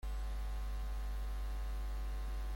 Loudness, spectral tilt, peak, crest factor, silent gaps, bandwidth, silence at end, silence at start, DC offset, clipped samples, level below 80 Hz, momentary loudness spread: -44 LUFS; -5.5 dB/octave; -34 dBFS; 6 dB; none; 16.5 kHz; 0 s; 0.05 s; under 0.1%; under 0.1%; -40 dBFS; 0 LU